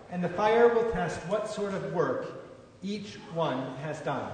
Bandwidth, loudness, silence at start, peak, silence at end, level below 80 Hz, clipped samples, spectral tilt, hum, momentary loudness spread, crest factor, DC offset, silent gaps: 9.6 kHz; -29 LUFS; 0 s; -10 dBFS; 0 s; -56 dBFS; under 0.1%; -6 dB/octave; none; 15 LU; 18 dB; under 0.1%; none